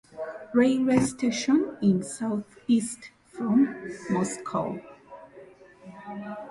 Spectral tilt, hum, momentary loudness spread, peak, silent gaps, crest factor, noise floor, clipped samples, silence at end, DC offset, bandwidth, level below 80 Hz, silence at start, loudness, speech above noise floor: -5.5 dB/octave; none; 20 LU; -10 dBFS; none; 18 dB; -50 dBFS; under 0.1%; 0 s; under 0.1%; 11.5 kHz; -62 dBFS; 0.15 s; -26 LUFS; 25 dB